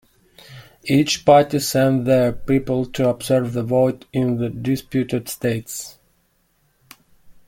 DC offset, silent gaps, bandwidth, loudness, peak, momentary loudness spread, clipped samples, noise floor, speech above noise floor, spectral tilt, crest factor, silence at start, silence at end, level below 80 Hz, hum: under 0.1%; none; 17 kHz; -19 LUFS; -2 dBFS; 10 LU; under 0.1%; -63 dBFS; 45 dB; -5.5 dB/octave; 18 dB; 0.5 s; 0.15 s; -48 dBFS; none